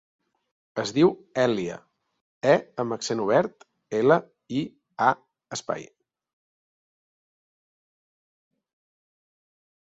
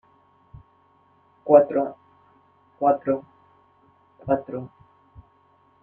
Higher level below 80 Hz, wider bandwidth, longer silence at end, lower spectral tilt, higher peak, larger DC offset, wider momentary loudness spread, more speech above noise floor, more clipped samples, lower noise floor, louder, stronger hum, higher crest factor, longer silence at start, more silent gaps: second, -68 dBFS vs -62 dBFS; first, 7.8 kHz vs 2.9 kHz; first, 4.05 s vs 1.15 s; second, -5.5 dB/octave vs -11 dB/octave; second, -6 dBFS vs -2 dBFS; neither; second, 13 LU vs 21 LU; first, over 66 dB vs 40 dB; neither; first, under -90 dBFS vs -60 dBFS; second, -25 LUFS vs -22 LUFS; neither; about the same, 22 dB vs 24 dB; second, 0.75 s vs 1.45 s; first, 2.21-2.41 s vs none